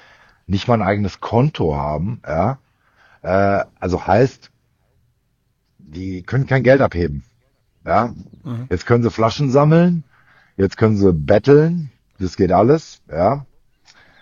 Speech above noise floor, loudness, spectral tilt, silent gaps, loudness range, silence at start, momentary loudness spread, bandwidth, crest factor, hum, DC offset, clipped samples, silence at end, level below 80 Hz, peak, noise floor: 49 dB; -17 LUFS; -8 dB/octave; none; 5 LU; 0.5 s; 16 LU; 7.4 kHz; 18 dB; none; under 0.1%; under 0.1%; 0.8 s; -42 dBFS; 0 dBFS; -65 dBFS